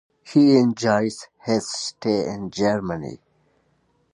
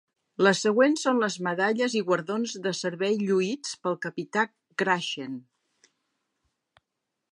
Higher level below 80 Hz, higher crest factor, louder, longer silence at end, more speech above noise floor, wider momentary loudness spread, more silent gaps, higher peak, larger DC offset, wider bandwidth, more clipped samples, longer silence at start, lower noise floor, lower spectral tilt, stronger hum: first, -58 dBFS vs -80 dBFS; about the same, 18 dB vs 22 dB; first, -21 LUFS vs -26 LUFS; second, 0.95 s vs 1.95 s; second, 44 dB vs 57 dB; first, 14 LU vs 10 LU; neither; about the same, -4 dBFS vs -6 dBFS; neither; about the same, 11 kHz vs 11.5 kHz; neither; second, 0.25 s vs 0.4 s; second, -65 dBFS vs -83 dBFS; first, -5.5 dB/octave vs -4 dB/octave; neither